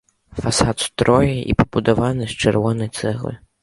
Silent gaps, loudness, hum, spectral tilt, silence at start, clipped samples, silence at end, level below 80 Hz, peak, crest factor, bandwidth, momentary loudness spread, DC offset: none; -19 LUFS; none; -5.5 dB/octave; 0.35 s; under 0.1%; 0.25 s; -36 dBFS; 0 dBFS; 18 dB; 11.5 kHz; 10 LU; under 0.1%